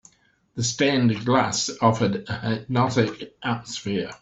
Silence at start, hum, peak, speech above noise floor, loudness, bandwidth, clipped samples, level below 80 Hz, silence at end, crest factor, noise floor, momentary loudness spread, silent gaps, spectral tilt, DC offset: 0.55 s; none; -4 dBFS; 38 dB; -23 LUFS; 8.2 kHz; under 0.1%; -58 dBFS; 0.05 s; 18 dB; -61 dBFS; 8 LU; none; -5 dB/octave; under 0.1%